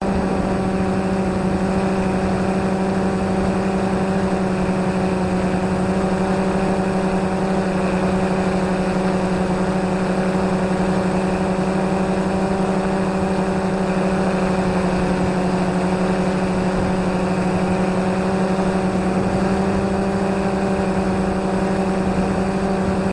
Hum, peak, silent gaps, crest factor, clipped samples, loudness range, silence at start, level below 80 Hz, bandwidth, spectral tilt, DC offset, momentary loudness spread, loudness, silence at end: none; -8 dBFS; none; 12 dB; under 0.1%; 0 LU; 0 s; -36 dBFS; 11.5 kHz; -7 dB/octave; under 0.1%; 1 LU; -20 LUFS; 0 s